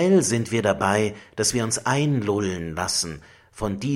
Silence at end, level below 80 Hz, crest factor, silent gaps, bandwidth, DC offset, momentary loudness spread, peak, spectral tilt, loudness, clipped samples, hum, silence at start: 0 s; -50 dBFS; 18 dB; none; 16.5 kHz; under 0.1%; 9 LU; -4 dBFS; -4.5 dB/octave; -23 LUFS; under 0.1%; none; 0 s